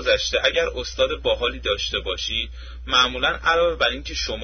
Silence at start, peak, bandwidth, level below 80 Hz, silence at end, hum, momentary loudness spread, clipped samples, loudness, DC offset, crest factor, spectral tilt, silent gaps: 0 s; -6 dBFS; 6.6 kHz; -36 dBFS; 0 s; none; 8 LU; under 0.1%; -21 LUFS; under 0.1%; 18 dB; -2.5 dB/octave; none